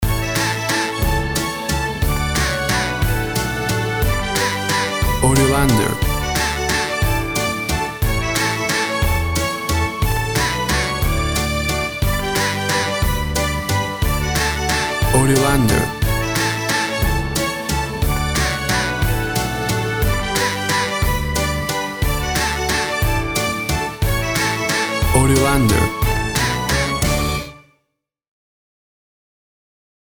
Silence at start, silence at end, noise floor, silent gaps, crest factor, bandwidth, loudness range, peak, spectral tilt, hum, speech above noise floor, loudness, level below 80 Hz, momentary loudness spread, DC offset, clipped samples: 0 s; 2.4 s; -74 dBFS; none; 18 dB; over 20 kHz; 2 LU; 0 dBFS; -4 dB/octave; none; 60 dB; -18 LUFS; -26 dBFS; 5 LU; under 0.1%; under 0.1%